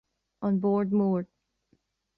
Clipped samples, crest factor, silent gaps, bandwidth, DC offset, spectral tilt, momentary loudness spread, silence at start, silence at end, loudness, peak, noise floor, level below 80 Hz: under 0.1%; 12 dB; none; 4.3 kHz; under 0.1%; -12.5 dB/octave; 9 LU; 0.4 s; 0.95 s; -27 LUFS; -16 dBFS; -71 dBFS; -70 dBFS